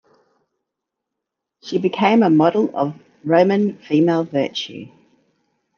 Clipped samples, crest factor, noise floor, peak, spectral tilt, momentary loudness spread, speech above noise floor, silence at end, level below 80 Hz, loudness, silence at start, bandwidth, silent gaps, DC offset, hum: under 0.1%; 18 dB; -81 dBFS; -2 dBFS; -7 dB/octave; 15 LU; 64 dB; 0.9 s; -70 dBFS; -18 LUFS; 1.65 s; 6.8 kHz; none; under 0.1%; none